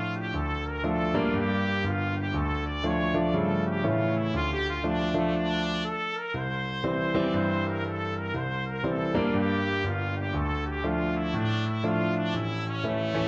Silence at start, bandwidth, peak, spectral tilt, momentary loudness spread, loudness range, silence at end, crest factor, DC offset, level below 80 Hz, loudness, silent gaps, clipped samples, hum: 0 s; 7.6 kHz; -12 dBFS; -7.5 dB/octave; 5 LU; 2 LU; 0 s; 14 dB; under 0.1%; -40 dBFS; -28 LUFS; none; under 0.1%; none